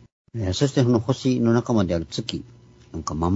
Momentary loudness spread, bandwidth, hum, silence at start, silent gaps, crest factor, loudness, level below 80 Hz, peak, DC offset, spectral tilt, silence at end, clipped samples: 14 LU; 8 kHz; none; 0.35 s; none; 16 dB; -23 LUFS; -46 dBFS; -6 dBFS; under 0.1%; -6.5 dB/octave; 0 s; under 0.1%